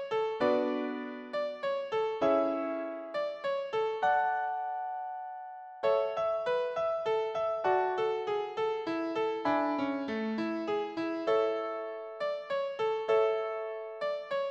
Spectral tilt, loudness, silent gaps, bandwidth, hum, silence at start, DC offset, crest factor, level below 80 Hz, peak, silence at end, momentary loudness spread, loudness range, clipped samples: -5.5 dB/octave; -32 LUFS; none; 8 kHz; none; 0 s; under 0.1%; 16 dB; -74 dBFS; -16 dBFS; 0 s; 9 LU; 2 LU; under 0.1%